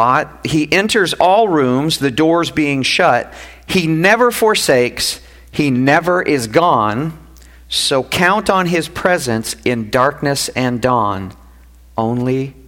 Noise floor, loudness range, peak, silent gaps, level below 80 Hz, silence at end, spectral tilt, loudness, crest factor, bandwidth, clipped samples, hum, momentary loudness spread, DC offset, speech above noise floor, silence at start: -42 dBFS; 3 LU; 0 dBFS; none; -44 dBFS; 0.15 s; -4.5 dB/octave; -14 LUFS; 14 dB; 18 kHz; under 0.1%; none; 8 LU; under 0.1%; 27 dB; 0 s